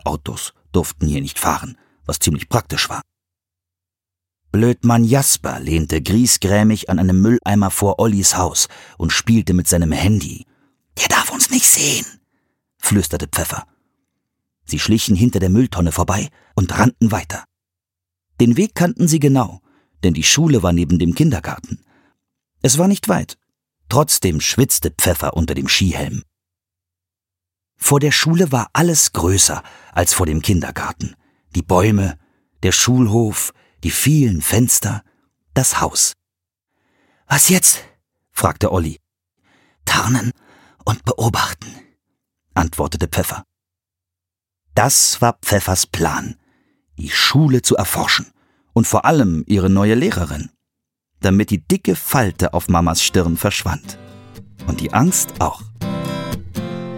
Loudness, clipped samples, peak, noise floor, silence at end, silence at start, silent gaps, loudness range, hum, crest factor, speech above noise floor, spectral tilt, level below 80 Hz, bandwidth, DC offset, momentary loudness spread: -16 LUFS; under 0.1%; 0 dBFS; -86 dBFS; 0 s; 0.05 s; none; 6 LU; none; 18 dB; 71 dB; -4 dB/octave; -36 dBFS; 17 kHz; under 0.1%; 13 LU